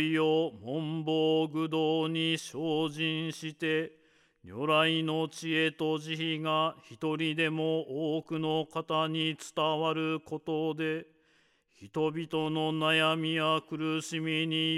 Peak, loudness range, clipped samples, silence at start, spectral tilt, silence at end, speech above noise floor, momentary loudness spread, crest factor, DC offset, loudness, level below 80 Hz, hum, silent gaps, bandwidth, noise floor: -14 dBFS; 3 LU; under 0.1%; 0 s; -5 dB/octave; 0 s; 38 dB; 8 LU; 16 dB; under 0.1%; -31 LUFS; -78 dBFS; none; none; 12.5 kHz; -68 dBFS